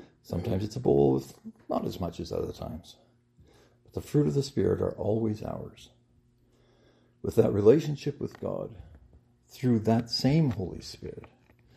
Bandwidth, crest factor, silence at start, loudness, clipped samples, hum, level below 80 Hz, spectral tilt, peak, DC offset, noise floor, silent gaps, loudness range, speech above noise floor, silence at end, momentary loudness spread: 14.5 kHz; 22 dB; 0.3 s; -28 LUFS; under 0.1%; none; -56 dBFS; -7.5 dB/octave; -8 dBFS; under 0.1%; -65 dBFS; none; 4 LU; 37 dB; 0.5 s; 18 LU